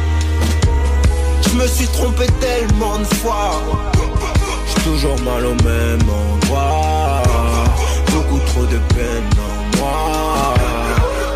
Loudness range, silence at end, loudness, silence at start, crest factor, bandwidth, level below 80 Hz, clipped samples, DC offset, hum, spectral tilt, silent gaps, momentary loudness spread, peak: 1 LU; 0 s; -16 LUFS; 0 s; 10 dB; 16 kHz; -18 dBFS; under 0.1%; under 0.1%; none; -5.5 dB/octave; none; 3 LU; -4 dBFS